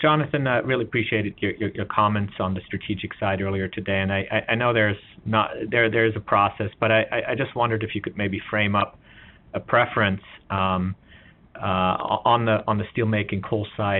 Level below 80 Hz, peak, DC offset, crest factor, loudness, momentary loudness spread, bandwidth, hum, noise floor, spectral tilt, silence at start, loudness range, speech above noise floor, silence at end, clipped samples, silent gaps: -54 dBFS; -4 dBFS; under 0.1%; 20 dB; -23 LUFS; 9 LU; 4.2 kHz; none; -51 dBFS; -4 dB/octave; 0 s; 3 LU; 27 dB; 0 s; under 0.1%; none